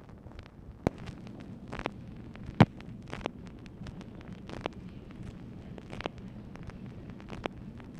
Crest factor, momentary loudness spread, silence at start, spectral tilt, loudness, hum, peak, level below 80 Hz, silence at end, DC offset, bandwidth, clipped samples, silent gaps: 28 dB; 13 LU; 0 s; -7.5 dB/octave; -37 LUFS; none; -8 dBFS; -52 dBFS; 0 s; under 0.1%; 11 kHz; under 0.1%; none